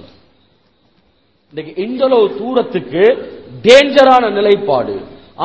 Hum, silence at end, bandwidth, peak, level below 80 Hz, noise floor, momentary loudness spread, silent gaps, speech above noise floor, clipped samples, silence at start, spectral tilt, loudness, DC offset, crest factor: none; 0 s; 8 kHz; 0 dBFS; -52 dBFS; -57 dBFS; 19 LU; none; 45 dB; 1%; 1.55 s; -4.5 dB/octave; -12 LUFS; 0.2%; 14 dB